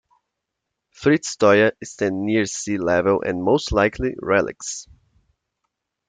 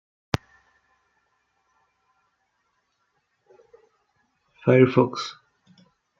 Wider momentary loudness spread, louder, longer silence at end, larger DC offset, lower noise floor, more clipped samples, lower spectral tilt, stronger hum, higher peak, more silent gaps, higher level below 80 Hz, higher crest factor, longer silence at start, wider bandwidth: second, 10 LU vs 15 LU; about the same, -20 LUFS vs -22 LUFS; first, 1.25 s vs 0.9 s; neither; first, -81 dBFS vs -73 dBFS; neither; second, -4.5 dB/octave vs -6 dB/octave; neither; about the same, -4 dBFS vs -2 dBFS; neither; first, -44 dBFS vs -58 dBFS; second, 18 dB vs 26 dB; second, 1 s vs 4.65 s; first, 9.6 kHz vs 7.4 kHz